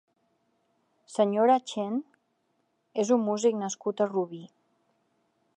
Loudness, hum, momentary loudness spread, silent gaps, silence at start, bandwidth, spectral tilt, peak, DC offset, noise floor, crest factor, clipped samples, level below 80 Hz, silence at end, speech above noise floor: -28 LUFS; none; 13 LU; none; 1.1 s; 10 kHz; -5 dB/octave; -12 dBFS; under 0.1%; -74 dBFS; 18 dB; under 0.1%; -86 dBFS; 1.1 s; 48 dB